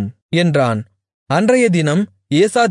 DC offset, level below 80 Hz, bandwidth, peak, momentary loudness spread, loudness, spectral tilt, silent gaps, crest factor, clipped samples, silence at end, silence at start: under 0.1%; -62 dBFS; 11 kHz; -2 dBFS; 7 LU; -16 LUFS; -6 dB/octave; 0.22-0.29 s, 1.14-1.26 s; 12 dB; under 0.1%; 0 s; 0 s